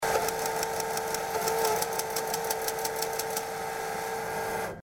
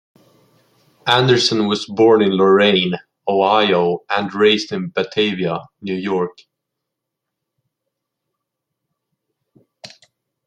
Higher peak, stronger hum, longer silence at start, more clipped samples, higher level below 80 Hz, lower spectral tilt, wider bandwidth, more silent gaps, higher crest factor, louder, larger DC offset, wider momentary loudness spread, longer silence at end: second, -12 dBFS vs 0 dBFS; neither; second, 0 s vs 1.05 s; neither; about the same, -58 dBFS vs -62 dBFS; second, -2 dB/octave vs -5 dB/octave; first, over 20 kHz vs 10 kHz; neither; about the same, 20 dB vs 18 dB; second, -30 LUFS vs -16 LUFS; neither; second, 6 LU vs 11 LU; second, 0 s vs 0.6 s